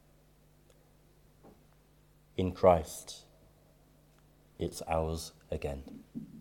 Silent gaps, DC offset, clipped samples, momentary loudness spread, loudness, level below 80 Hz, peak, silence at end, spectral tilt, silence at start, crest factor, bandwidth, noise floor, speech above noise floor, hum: none; under 0.1%; under 0.1%; 21 LU; -33 LUFS; -54 dBFS; -10 dBFS; 0 s; -6 dB/octave; 1.45 s; 26 dB; 18 kHz; -64 dBFS; 31 dB; none